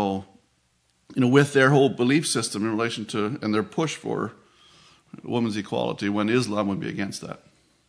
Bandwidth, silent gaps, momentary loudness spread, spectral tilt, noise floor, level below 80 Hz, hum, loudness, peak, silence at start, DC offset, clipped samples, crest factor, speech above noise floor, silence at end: 11 kHz; none; 15 LU; -5 dB/octave; -67 dBFS; -68 dBFS; none; -24 LUFS; -4 dBFS; 0 s; under 0.1%; under 0.1%; 22 dB; 44 dB; 0.5 s